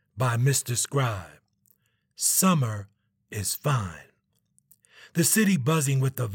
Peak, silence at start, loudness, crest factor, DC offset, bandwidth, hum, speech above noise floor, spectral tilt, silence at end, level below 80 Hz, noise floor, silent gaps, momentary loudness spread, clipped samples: -8 dBFS; 0.15 s; -24 LUFS; 18 dB; under 0.1%; 18 kHz; none; 45 dB; -4.5 dB/octave; 0 s; -64 dBFS; -69 dBFS; none; 12 LU; under 0.1%